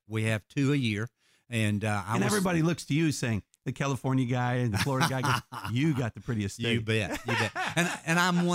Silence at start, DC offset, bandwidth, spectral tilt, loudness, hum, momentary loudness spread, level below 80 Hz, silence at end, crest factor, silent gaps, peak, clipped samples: 0.1 s; under 0.1%; 16 kHz; -5 dB/octave; -29 LUFS; none; 7 LU; -58 dBFS; 0 s; 18 dB; none; -10 dBFS; under 0.1%